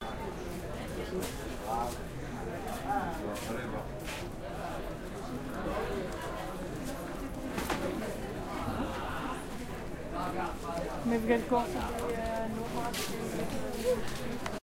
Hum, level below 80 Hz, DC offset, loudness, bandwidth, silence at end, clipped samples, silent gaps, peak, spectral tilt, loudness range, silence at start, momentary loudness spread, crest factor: none; -46 dBFS; under 0.1%; -36 LUFS; 16.5 kHz; 0.05 s; under 0.1%; none; -14 dBFS; -5 dB/octave; 5 LU; 0 s; 7 LU; 20 dB